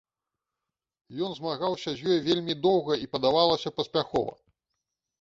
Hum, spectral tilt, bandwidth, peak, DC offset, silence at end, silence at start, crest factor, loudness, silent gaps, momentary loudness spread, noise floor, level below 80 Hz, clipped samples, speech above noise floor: none; -6 dB/octave; 7.6 kHz; -8 dBFS; under 0.1%; 0.9 s; 1.1 s; 22 dB; -27 LUFS; none; 10 LU; -88 dBFS; -62 dBFS; under 0.1%; 61 dB